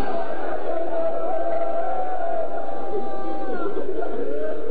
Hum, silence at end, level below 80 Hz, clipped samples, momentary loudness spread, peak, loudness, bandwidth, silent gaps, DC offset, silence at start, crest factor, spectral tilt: none; 0 s; -56 dBFS; under 0.1%; 4 LU; -10 dBFS; -27 LUFS; 4.9 kHz; none; 20%; 0 s; 12 dB; -9.5 dB/octave